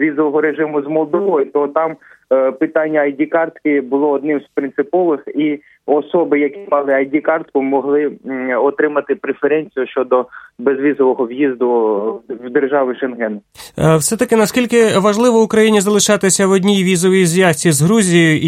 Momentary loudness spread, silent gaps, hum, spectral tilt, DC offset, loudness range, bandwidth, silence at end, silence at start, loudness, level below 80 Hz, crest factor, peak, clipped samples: 8 LU; none; none; -5 dB/octave; under 0.1%; 5 LU; 16 kHz; 0 s; 0 s; -15 LUFS; -54 dBFS; 14 dB; 0 dBFS; under 0.1%